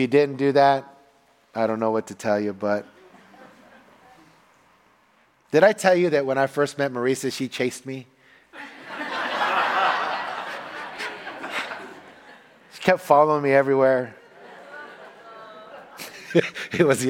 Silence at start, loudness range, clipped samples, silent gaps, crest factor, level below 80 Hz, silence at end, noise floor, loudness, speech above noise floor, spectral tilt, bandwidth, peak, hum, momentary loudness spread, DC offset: 0 s; 6 LU; under 0.1%; none; 22 dB; -70 dBFS; 0 s; -60 dBFS; -22 LUFS; 40 dB; -5 dB/octave; 17 kHz; -2 dBFS; none; 23 LU; under 0.1%